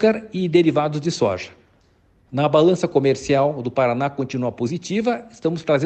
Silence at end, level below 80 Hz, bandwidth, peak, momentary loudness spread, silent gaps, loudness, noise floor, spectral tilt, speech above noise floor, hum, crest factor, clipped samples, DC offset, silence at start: 0 s; -56 dBFS; 8.8 kHz; -4 dBFS; 8 LU; none; -20 LUFS; -58 dBFS; -6.5 dB/octave; 38 dB; none; 16 dB; under 0.1%; under 0.1%; 0 s